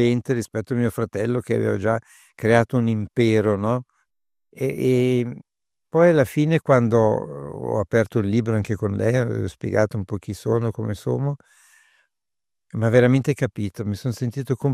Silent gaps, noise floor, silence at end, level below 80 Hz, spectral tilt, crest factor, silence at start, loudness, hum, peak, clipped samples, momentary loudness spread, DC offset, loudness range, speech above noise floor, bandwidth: none; -88 dBFS; 0 s; -56 dBFS; -7.5 dB/octave; 18 dB; 0 s; -22 LUFS; none; -2 dBFS; under 0.1%; 10 LU; under 0.1%; 4 LU; 68 dB; 14.5 kHz